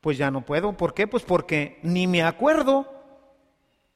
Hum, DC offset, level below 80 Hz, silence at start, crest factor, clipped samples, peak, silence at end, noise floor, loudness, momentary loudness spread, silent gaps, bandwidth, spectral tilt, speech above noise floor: none; under 0.1%; -52 dBFS; 0.05 s; 18 dB; under 0.1%; -6 dBFS; 0.95 s; -67 dBFS; -23 LUFS; 5 LU; none; 14.5 kHz; -6.5 dB/octave; 45 dB